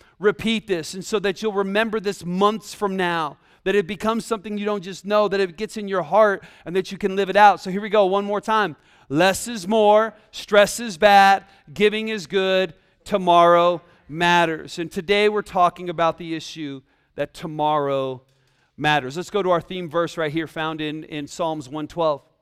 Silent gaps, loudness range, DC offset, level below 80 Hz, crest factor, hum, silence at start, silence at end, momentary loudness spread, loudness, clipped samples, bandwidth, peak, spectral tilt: none; 7 LU; under 0.1%; -56 dBFS; 20 dB; none; 0.2 s; 0.25 s; 14 LU; -21 LUFS; under 0.1%; 15.5 kHz; -2 dBFS; -4.5 dB/octave